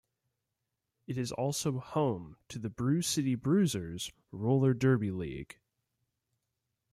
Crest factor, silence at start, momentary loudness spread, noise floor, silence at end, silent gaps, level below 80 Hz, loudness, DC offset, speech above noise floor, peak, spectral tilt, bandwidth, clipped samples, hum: 18 dB; 1.1 s; 13 LU; -86 dBFS; 1.5 s; none; -64 dBFS; -32 LUFS; under 0.1%; 55 dB; -16 dBFS; -6 dB/octave; 14.5 kHz; under 0.1%; none